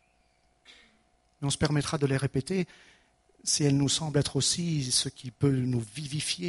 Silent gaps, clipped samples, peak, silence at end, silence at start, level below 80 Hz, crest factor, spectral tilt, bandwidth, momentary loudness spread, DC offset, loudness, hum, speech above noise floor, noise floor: none; under 0.1%; -12 dBFS; 0 s; 0.7 s; -56 dBFS; 18 dB; -4 dB/octave; 11.5 kHz; 9 LU; under 0.1%; -28 LUFS; none; 40 dB; -68 dBFS